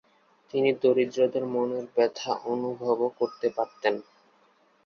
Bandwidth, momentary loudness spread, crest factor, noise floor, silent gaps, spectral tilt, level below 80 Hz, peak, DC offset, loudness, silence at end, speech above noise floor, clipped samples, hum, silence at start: 6.8 kHz; 6 LU; 18 dB; -63 dBFS; none; -5.5 dB/octave; -76 dBFS; -10 dBFS; under 0.1%; -27 LUFS; 0.85 s; 37 dB; under 0.1%; none; 0.55 s